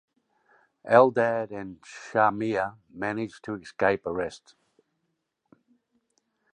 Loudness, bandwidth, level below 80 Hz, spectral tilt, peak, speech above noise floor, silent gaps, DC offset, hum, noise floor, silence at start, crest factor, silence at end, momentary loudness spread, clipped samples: -26 LUFS; 10 kHz; -64 dBFS; -6.5 dB/octave; -2 dBFS; 53 dB; none; under 0.1%; none; -78 dBFS; 0.85 s; 26 dB; 2.15 s; 18 LU; under 0.1%